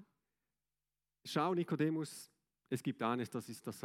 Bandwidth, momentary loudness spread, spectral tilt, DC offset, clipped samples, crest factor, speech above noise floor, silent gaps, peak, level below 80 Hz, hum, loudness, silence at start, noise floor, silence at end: 16.5 kHz; 15 LU; -6 dB/octave; under 0.1%; under 0.1%; 20 dB; over 52 dB; none; -20 dBFS; -90 dBFS; none; -39 LUFS; 0 s; under -90 dBFS; 0 s